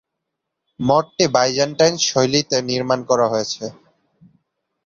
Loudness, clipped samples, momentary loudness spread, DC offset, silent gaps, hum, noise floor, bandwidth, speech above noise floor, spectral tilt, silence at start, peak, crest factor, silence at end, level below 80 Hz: -18 LUFS; under 0.1%; 9 LU; under 0.1%; none; none; -79 dBFS; 7.6 kHz; 61 dB; -3.5 dB/octave; 0.8 s; -2 dBFS; 18 dB; 1.15 s; -58 dBFS